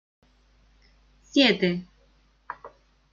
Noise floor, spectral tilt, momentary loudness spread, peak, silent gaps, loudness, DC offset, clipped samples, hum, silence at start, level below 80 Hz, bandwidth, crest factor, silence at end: -62 dBFS; -5 dB/octave; 22 LU; -6 dBFS; none; -23 LUFS; under 0.1%; under 0.1%; none; 1.35 s; -60 dBFS; 7.4 kHz; 24 dB; 0.45 s